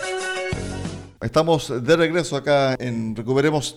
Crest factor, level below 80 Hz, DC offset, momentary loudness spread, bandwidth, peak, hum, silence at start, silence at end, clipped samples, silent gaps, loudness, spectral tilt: 16 dB; -46 dBFS; under 0.1%; 11 LU; 15 kHz; -6 dBFS; none; 0 s; 0 s; under 0.1%; none; -21 LUFS; -5 dB/octave